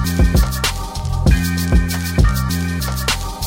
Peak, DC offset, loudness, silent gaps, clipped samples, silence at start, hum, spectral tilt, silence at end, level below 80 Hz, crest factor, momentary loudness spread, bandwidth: -4 dBFS; under 0.1%; -18 LUFS; none; under 0.1%; 0 s; none; -5 dB/octave; 0 s; -20 dBFS; 12 dB; 5 LU; 16.5 kHz